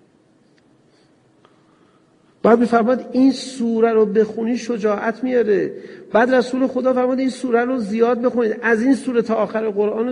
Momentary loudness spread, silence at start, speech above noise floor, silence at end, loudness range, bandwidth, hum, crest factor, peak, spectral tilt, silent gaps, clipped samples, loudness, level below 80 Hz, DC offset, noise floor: 6 LU; 2.45 s; 38 dB; 0 s; 2 LU; 10.5 kHz; none; 18 dB; -2 dBFS; -6 dB/octave; none; under 0.1%; -18 LUFS; -64 dBFS; under 0.1%; -56 dBFS